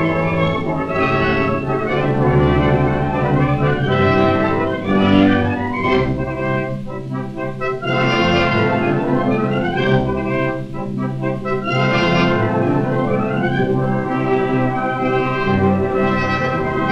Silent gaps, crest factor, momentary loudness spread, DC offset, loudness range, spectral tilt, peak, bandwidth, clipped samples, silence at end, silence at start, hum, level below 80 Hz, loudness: none; 16 dB; 7 LU; under 0.1%; 3 LU; -8 dB/octave; -2 dBFS; 7.8 kHz; under 0.1%; 0 s; 0 s; none; -36 dBFS; -17 LUFS